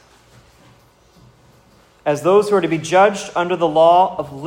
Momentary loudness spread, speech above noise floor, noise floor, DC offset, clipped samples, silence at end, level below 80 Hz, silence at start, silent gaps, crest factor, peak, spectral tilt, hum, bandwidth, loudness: 9 LU; 36 dB; -51 dBFS; under 0.1%; under 0.1%; 0 s; -58 dBFS; 2.05 s; none; 16 dB; -2 dBFS; -5 dB/octave; none; 16 kHz; -16 LUFS